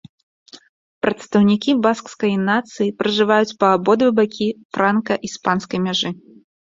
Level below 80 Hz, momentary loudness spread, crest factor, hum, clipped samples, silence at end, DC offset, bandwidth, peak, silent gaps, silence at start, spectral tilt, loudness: -60 dBFS; 8 LU; 18 dB; none; under 0.1%; 0.55 s; under 0.1%; 7.8 kHz; -2 dBFS; 0.69-1.01 s, 4.65-4.70 s; 0.55 s; -5.5 dB/octave; -18 LUFS